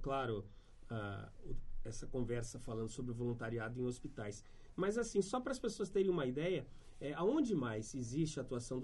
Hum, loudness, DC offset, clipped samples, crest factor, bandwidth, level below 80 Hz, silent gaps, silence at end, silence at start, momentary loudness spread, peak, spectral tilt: none; -41 LUFS; under 0.1%; under 0.1%; 18 dB; 11.5 kHz; -52 dBFS; none; 0 s; 0 s; 14 LU; -22 dBFS; -6 dB/octave